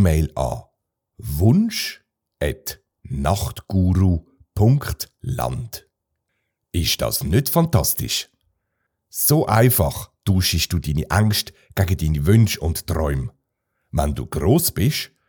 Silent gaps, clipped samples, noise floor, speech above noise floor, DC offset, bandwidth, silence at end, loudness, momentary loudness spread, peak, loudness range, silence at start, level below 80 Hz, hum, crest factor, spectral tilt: none; under 0.1%; -75 dBFS; 56 dB; under 0.1%; over 20 kHz; 0.25 s; -20 LUFS; 13 LU; -2 dBFS; 4 LU; 0 s; -36 dBFS; none; 20 dB; -5 dB/octave